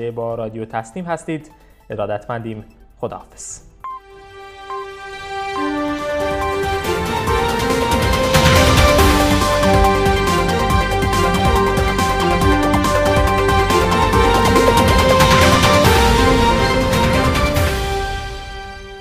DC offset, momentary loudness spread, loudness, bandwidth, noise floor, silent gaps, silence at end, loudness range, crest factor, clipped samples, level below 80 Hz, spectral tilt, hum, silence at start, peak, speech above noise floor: under 0.1%; 18 LU; -15 LUFS; 16 kHz; -38 dBFS; none; 0 s; 15 LU; 16 dB; under 0.1%; -24 dBFS; -5 dB/octave; none; 0 s; 0 dBFS; 13 dB